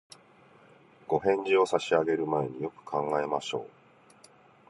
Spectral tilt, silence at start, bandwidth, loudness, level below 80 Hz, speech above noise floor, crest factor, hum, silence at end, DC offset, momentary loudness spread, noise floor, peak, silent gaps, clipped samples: -5.5 dB/octave; 1.1 s; 11.5 kHz; -29 LUFS; -70 dBFS; 30 dB; 20 dB; none; 1 s; under 0.1%; 13 LU; -58 dBFS; -10 dBFS; none; under 0.1%